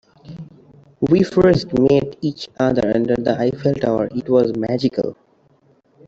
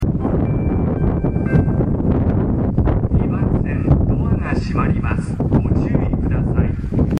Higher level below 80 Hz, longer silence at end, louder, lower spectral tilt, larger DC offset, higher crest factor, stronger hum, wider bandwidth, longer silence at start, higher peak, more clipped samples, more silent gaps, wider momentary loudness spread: second, -46 dBFS vs -24 dBFS; first, 0.95 s vs 0 s; about the same, -18 LUFS vs -18 LUFS; second, -8 dB/octave vs -10 dB/octave; neither; about the same, 16 dB vs 14 dB; neither; second, 7.8 kHz vs 9.6 kHz; first, 0.25 s vs 0 s; about the same, -4 dBFS vs -2 dBFS; neither; neither; first, 11 LU vs 3 LU